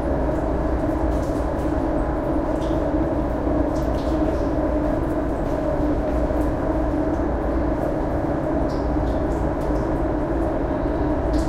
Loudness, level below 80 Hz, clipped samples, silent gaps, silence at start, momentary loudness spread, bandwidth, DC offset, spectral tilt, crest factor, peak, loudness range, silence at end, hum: -23 LUFS; -28 dBFS; under 0.1%; none; 0 s; 1 LU; 11.5 kHz; under 0.1%; -8.5 dB/octave; 12 dB; -8 dBFS; 1 LU; 0 s; none